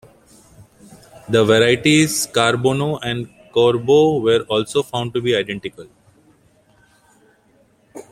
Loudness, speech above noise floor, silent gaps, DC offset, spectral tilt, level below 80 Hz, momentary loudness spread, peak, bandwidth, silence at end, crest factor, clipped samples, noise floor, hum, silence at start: -17 LUFS; 40 dB; none; under 0.1%; -4.5 dB/octave; -54 dBFS; 11 LU; -2 dBFS; 15.5 kHz; 0.1 s; 18 dB; under 0.1%; -56 dBFS; none; 0.6 s